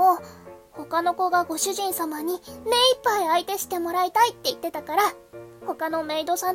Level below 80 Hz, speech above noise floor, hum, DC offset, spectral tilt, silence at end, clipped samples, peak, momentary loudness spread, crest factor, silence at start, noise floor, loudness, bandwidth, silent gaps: -64 dBFS; 21 dB; none; under 0.1%; -1.5 dB/octave; 0 s; under 0.1%; -6 dBFS; 15 LU; 18 dB; 0 s; -45 dBFS; -24 LUFS; 16.5 kHz; none